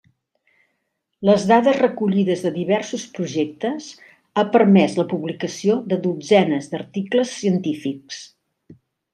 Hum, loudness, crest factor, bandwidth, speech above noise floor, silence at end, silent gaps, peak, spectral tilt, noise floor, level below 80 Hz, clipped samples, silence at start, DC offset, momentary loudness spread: none; -20 LUFS; 18 dB; 9.8 kHz; 55 dB; 0.4 s; none; -2 dBFS; -6 dB/octave; -74 dBFS; -66 dBFS; under 0.1%; 1.2 s; under 0.1%; 13 LU